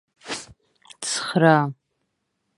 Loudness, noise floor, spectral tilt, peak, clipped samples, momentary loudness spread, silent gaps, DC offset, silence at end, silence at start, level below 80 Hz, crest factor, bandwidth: -21 LUFS; -75 dBFS; -4.5 dB/octave; -2 dBFS; under 0.1%; 16 LU; none; under 0.1%; 0.85 s; 0.25 s; -66 dBFS; 22 dB; 11.5 kHz